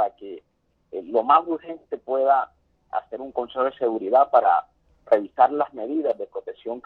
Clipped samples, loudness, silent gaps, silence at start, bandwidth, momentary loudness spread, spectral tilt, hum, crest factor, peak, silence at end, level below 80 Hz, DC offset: under 0.1%; -22 LUFS; none; 0 s; 4.6 kHz; 16 LU; -7 dB/octave; none; 18 dB; -4 dBFS; 0.05 s; -68 dBFS; under 0.1%